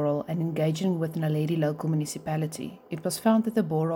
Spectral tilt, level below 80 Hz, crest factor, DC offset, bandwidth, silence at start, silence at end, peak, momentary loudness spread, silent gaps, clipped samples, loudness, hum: -6.5 dB/octave; -66 dBFS; 16 dB; under 0.1%; 17 kHz; 0 s; 0 s; -10 dBFS; 9 LU; none; under 0.1%; -27 LUFS; none